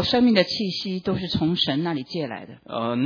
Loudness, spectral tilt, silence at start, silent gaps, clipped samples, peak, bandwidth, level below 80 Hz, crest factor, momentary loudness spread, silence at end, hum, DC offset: -23 LUFS; -6.5 dB/octave; 0 s; none; under 0.1%; -4 dBFS; 5.4 kHz; -52 dBFS; 18 dB; 13 LU; 0 s; none; under 0.1%